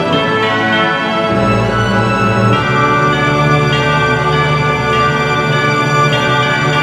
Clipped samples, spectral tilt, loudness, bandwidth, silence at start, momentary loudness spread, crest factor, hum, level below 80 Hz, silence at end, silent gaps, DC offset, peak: under 0.1%; -5.5 dB/octave; -12 LUFS; 12.5 kHz; 0 s; 2 LU; 12 dB; none; -34 dBFS; 0 s; none; under 0.1%; 0 dBFS